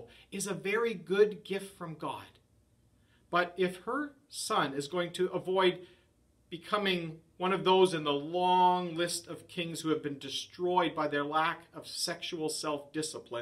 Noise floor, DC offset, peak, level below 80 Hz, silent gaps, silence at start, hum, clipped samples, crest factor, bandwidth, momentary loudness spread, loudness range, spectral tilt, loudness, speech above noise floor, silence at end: -68 dBFS; under 0.1%; -14 dBFS; -72 dBFS; none; 0 s; none; under 0.1%; 20 dB; 13.5 kHz; 14 LU; 5 LU; -4 dB/octave; -32 LUFS; 36 dB; 0 s